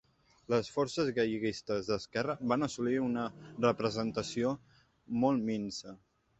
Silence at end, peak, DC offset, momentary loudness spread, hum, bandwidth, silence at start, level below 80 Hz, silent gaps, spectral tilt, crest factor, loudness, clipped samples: 0.45 s; -14 dBFS; under 0.1%; 8 LU; none; 8.4 kHz; 0.5 s; -66 dBFS; none; -5.5 dB/octave; 20 dB; -34 LUFS; under 0.1%